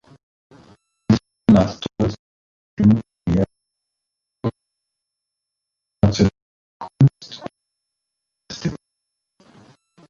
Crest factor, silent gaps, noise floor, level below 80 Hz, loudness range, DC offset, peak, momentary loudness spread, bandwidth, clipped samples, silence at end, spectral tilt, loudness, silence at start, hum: 20 dB; 2.19-2.77 s, 6.42-6.80 s; -83 dBFS; -42 dBFS; 6 LU; under 0.1%; -2 dBFS; 22 LU; 7.4 kHz; under 0.1%; 1.35 s; -7.5 dB/octave; -20 LUFS; 1.1 s; 50 Hz at -45 dBFS